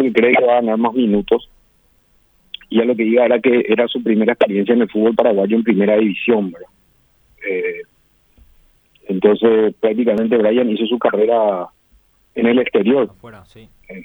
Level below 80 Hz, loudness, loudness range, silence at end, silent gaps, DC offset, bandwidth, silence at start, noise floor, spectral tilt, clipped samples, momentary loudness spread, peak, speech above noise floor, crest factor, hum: -54 dBFS; -15 LUFS; 5 LU; 0 s; none; under 0.1%; over 20 kHz; 0 s; -57 dBFS; -8.5 dB/octave; under 0.1%; 11 LU; 0 dBFS; 42 dB; 16 dB; none